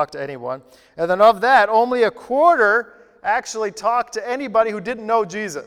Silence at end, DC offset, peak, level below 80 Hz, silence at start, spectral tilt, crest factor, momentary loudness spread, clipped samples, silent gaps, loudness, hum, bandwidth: 0.05 s; under 0.1%; 0 dBFS; -58 dBFS; 0 s; -4 dB/octave; 18 dB; 14 LU; under 0.1%; none; -18 LUFS; none; 13.5 kHz